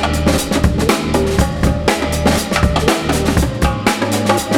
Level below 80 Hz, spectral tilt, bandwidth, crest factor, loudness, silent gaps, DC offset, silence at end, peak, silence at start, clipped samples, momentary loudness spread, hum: -22 dBFS; -5 dB/octave; 18.5 kHz; 14 dB; -15 LUFS; none; under 0.1%; 0 s; 0 dBFS; 0 s; under 0.1%; 2 LU; none